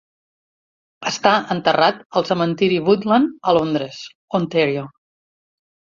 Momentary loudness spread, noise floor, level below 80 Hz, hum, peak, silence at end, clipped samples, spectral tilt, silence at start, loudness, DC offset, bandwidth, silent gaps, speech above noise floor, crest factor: 11 LU; under -90 dBFS; -60 dBFS; none; -2 dBFS; 0.95 s; under 0.1%; -5.5 dB/octave; 1 s; -18 LUFS; under 0.1%; 7.6 kHz; 2.06-2.10 s, 4.15-4.28 s; over 72 dB; 18 dB